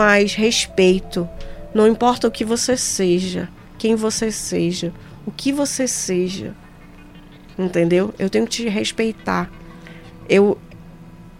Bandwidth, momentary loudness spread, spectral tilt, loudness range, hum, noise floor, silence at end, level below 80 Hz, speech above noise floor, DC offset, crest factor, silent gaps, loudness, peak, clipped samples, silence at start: 16 kHz; 17 LU; -4 dB/octave; 5 LU; none; -42 dBFS; 0.1 s; -42 dBFS; 23 dB; under 0.1%; 18 dB; none; -19 LUFS; -2 dBFS; under 0.1%; 0 s